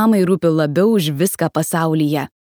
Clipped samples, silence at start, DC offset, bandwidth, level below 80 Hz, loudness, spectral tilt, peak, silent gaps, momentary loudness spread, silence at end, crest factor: under 0.1%; 0 s; under 0.1%; over 20 kHz; -62 dBFS; -16 LUFS; -6 dB/octave; -2 dBFS; none; 4 LU; 0.15 s; 14 dB